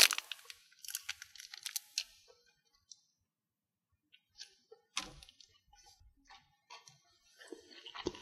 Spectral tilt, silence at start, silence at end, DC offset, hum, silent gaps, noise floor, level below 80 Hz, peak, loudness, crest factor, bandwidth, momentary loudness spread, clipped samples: 1 dB/octave; 0 s; 0 s; under 0.1%; none; none; under -90 dBFS; -72 dBFS; -4 dBFS; -40 LUFS; 38 dB; 15.5 kHz; 22 LU; under 0.1%